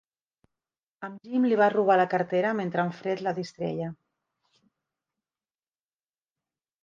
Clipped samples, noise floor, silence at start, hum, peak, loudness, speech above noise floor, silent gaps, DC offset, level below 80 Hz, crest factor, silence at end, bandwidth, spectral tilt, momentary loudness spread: under 0.1%; under -90 dBFS; 1 s; none; -10 dBFS; -26 LUFS; over 64 dB; none; under 0.1%; -76 dBFS; 20 dB; 2.9 s; 7.6 kHz; -7.5 dB/octave; 15 LU